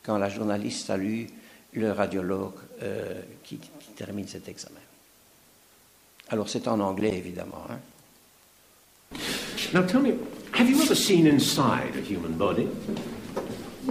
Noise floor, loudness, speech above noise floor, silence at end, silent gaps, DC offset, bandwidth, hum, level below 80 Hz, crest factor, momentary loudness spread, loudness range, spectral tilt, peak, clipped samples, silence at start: -58 dBFS; -27 LUFS; 32 dB; 0 s; none; under 0.1%; 15.5 kHz; none; -60 dBFS; 20 dB; 21 LU; 15 LU; -4.5 dB/octave; -8 dBFS; under 0.1%; 0.05 s